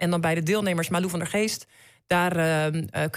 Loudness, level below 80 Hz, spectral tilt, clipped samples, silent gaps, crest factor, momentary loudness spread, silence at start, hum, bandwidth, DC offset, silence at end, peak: -25 LUFS; -60 dBFS; -5 dB/octave; under 0.1%; none; 14 dB; 4 LU; 0 s; none; 16 kHz; under 0.1%; 0 s; -12 dBFS